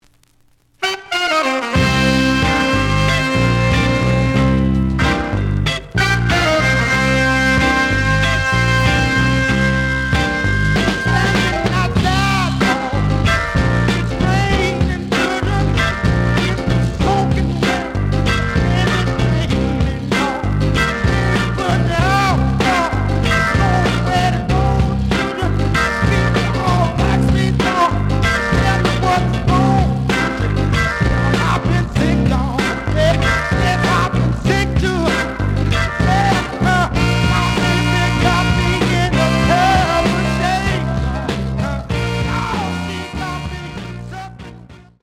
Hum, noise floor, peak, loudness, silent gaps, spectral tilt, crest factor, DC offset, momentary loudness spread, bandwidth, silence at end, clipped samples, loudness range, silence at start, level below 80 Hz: none; -54 dBFS; -2 dBFS; -16 LUFS; none; -5.5 dB/octave; 14 dB; under 0.1%; 5 LU; 15 kHz; 0.25 s; under 0.1%; 2 LU; 0.8 s; -24 dBFS